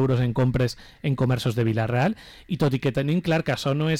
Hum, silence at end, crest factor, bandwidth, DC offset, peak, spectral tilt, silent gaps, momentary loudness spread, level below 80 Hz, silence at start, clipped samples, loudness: none; 0 s; 8 dB; 14.5 kHz; under 0.1%; -14 dBFS; -7 dB/octave; none; 6 LU; -46 dBFS; 0 s; under 0.1%; -24 LUFS